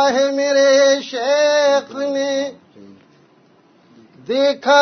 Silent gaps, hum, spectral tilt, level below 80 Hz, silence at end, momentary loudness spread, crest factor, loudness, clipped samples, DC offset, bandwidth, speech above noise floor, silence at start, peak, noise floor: none; none; -2 dB/octave; -72 dBFS; 0 s; 10 LU; 16 dB; -16 LUFS; under 0.1%; under 0.1%; 6.6 kHz; 37 dB; 0 s; 0 dBFS; -53 dBFS